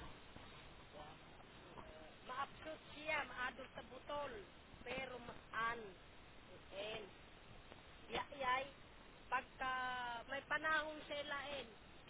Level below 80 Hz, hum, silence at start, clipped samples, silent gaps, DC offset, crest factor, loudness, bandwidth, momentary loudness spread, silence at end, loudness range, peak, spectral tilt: -68 dBFS; none; 0 s; under 0.1%; none; under 0.1%; 20 dB; -45 LUFS; 4 kHz; 19 LU; 0 s; 6 LU; -28 dBFS; -1 dB/octave